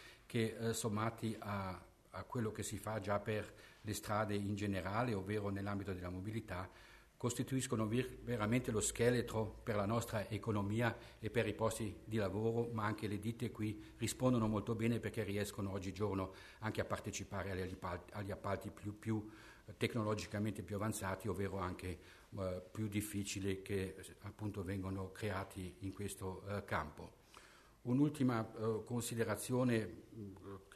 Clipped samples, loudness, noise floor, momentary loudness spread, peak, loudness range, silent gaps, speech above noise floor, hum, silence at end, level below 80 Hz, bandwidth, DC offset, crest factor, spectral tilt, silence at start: under 0.1%; -41 LUFS; -62 dBFS; 11 LU; -20 dBFS; 5 LU; none; 22 dB; none; 0 s; -64 dBFS; 13.5 kHz; under 0.1%; 20 dB; -5.5 dB/octave; 0 s